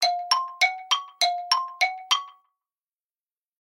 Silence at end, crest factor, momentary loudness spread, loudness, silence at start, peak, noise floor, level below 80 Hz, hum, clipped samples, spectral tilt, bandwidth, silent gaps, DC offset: 1.3 s; 20 dB; 4 LU; -24 LUFS; 0 s; -8 dBFS; under -90 dBFS; under -90 dBFS; none; under 0.1%; 4.5 dB/octave; 16.5 kHz; none; under 0.1%